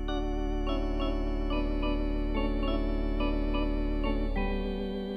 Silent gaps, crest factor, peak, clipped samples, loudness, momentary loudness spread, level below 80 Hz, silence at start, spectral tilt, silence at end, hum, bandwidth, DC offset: none; 14 dB; -16 dBFS; under 0.1%; -32 LUFS; 2 LU; -32 dBFS; 0 s; -8 dB/octave; 0 s; none; 6 kHz; under 0.1%